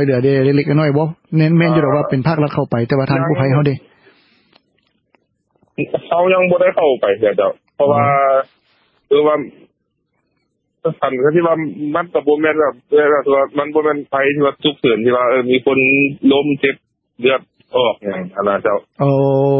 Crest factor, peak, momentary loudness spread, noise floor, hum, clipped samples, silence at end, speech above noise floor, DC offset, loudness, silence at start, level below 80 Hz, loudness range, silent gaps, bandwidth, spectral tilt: 14 dB; 0 dBFS; 7 LU; -68 dBFS; none; under 0.1%; 0 s; 54 dB; under 0.1%; -15 LUFS; 0 s; -56 dBFS; 5 LU; none; 5.6 kHz; -11.5 dB/octave